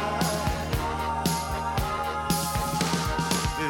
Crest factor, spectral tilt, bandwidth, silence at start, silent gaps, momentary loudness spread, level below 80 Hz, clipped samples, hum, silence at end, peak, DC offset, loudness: 18 dB; -4 dB/octave; 17 kHz; 0 s; none; 3 LU; -38 dBFS; under 0.1%; none; 0 s; -10 dBFS; under 0.1%; -27 LUFS